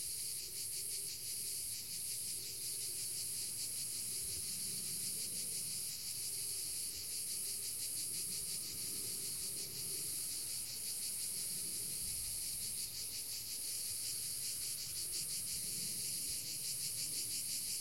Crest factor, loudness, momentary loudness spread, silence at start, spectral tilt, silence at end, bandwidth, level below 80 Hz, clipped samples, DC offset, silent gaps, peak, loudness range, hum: 14 dB; -39 LUFS; 2 LU; 0 s; 0.5 dB/octave; 0 s; 16.5 kHz; -68 dBFS; under 0.1%; 0.1%; none; -28 dBFS; 1 LU; none